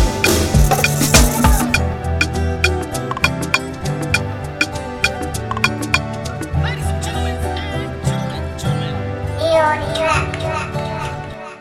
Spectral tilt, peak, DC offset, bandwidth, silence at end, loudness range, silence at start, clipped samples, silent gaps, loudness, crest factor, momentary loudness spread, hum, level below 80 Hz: -4.5 dB/octave; 0 dBFS; under 0.1%; 18 kHz; 0 s; 5 LU; 0 s; under 0.1%; none; -18 LUFS; 18 dB; 10 LU; none; -24 dBFS